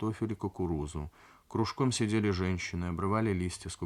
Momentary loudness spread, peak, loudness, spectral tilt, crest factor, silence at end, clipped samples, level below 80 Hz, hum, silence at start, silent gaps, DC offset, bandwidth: 9 LU; -14 dBFS; -33 LUFS; -6 dB/octave; 18 dB; 0 s; under 0.1%; -54 dBFS; none; 0 s; none; under 0.1%; 13 kHz